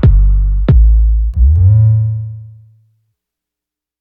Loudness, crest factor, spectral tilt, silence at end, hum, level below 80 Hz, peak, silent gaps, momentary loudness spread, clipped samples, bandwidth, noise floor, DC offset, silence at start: -11 LUFS; 10 dB; -12 dB/octave; 1.55 s; none; -12 dBFS; 0 dBFS; none; 12 LU; under 0.1%; 3.8 kHz; -85 dBFS; under 0.1%; 0 s